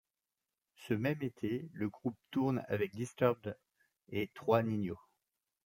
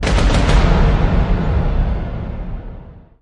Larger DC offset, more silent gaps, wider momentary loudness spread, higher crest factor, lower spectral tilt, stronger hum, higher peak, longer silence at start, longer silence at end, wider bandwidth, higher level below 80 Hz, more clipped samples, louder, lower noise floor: neither; neither; second, 10 LU vs 17 LU; first, 24 dB vs 14 dB; about the same, -7.5 dB/octave vs -6.5 dB/octave; neither; second, -14 dBFS vs 0 dBFS; first, 0.8 s vs 0 s; first, 0.7 s vs 0.2 s; first, 16.5 kHz vs 10.5 kHz; second, -74 dBFS vs -16 dBFS; neither; second, -37 LUFS vs -17 LUFS; first, under -90 dBFS vs -36 dBFS